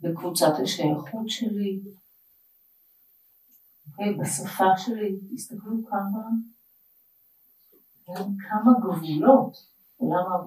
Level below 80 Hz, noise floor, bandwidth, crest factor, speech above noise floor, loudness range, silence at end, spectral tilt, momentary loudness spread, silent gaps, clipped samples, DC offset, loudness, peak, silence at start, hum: -82 dBFS; -61 dBFS; 15.5 kHz; 24 dB; 37 dB; 9 LU; 0 s; -5 dB/octave; 15 LU; none; under 0.1%; under 0.1%; -25 LUFS; -2 dBFS; 0 s; none